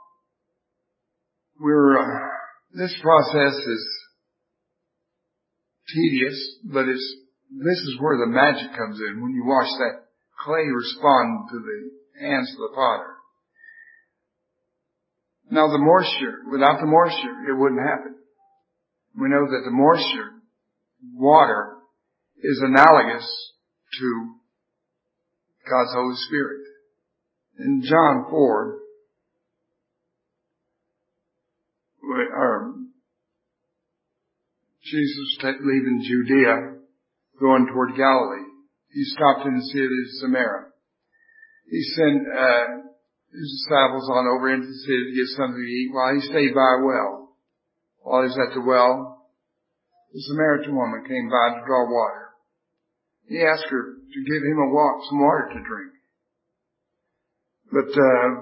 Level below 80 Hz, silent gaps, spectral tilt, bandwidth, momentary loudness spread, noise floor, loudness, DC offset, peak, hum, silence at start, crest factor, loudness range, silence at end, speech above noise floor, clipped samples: -70 dBFS; none; -7.5 dB/octave; 5.8 kHz; 16 LU; -79 dBFS; -21 LUFS; under 0.1%; 0 dBFS; none; 1.6 s; 22 dB; 8 LU; 0 s; 59 dB; under 0.1%